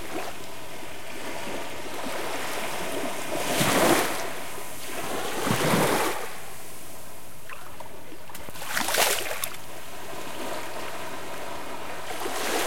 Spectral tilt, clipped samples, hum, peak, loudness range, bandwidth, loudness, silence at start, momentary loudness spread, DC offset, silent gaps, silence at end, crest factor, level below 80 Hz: -3 dB/octave; under 0.1%; none; -6 dBFS; 8 LU; 16.5 kHz; -28 LUFS; 0 s; 19 LU; 3%; none; 0 s; 24 dB; -58 dBFS